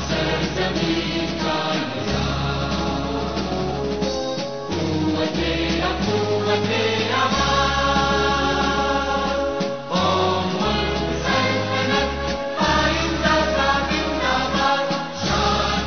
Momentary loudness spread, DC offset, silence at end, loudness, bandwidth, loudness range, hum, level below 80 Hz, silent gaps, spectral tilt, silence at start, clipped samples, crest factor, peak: 6 LU; 0.7%; 0 s; -21 LUFS; 6.6 kHz; 4 LU; none; -34 dBFS; none; -3 dB/octave; 0 s; under 0.1%; 16 dB; -6 dBFS